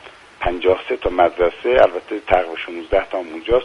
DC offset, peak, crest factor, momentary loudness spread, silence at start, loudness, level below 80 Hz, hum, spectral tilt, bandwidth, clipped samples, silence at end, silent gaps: under 0.1%; 0 dBFS; 18 dB; 11 LU; 0.05 s; -19 LUFS; -36 dBFS; none; -6 dB/octave; 10 kHz; under 0.1%; 0 s; none